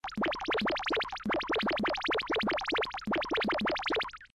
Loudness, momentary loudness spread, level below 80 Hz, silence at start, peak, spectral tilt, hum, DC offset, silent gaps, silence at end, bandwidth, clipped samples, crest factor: -31 LUFS; 3 LU; -56 dBFS; 0.05 s; -22 dBFS; -4.5 dB/octave; none; under 0.1%; none; 0.1 s; 13 kHz; under 0.1%; 10 dB